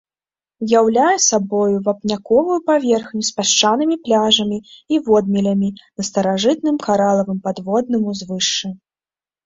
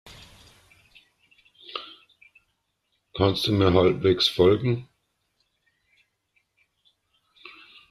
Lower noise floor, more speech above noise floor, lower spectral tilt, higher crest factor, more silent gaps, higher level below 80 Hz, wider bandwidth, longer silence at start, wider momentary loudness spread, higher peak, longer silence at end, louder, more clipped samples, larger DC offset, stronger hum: first, under -90 dBFS vs -75 dBFS; first, over 73 dB vs 54 dB; second, -3.5 dB/octave vs -6.5 dB/octave; second, 16 dB vs 22 dB; neither; about the same, -58 dBFS vs -56 dBFS; second, 7.8 kHz vs 13 kHz; first, 0.6 s vs 0.05 s; second, 9 LU vs 26 LU; first, -2 dBFS vs -6 dBFS; first, 0.7 s vs 0.4 s; first, -17 LUFS vs -22 LUFS; neither; neither; neither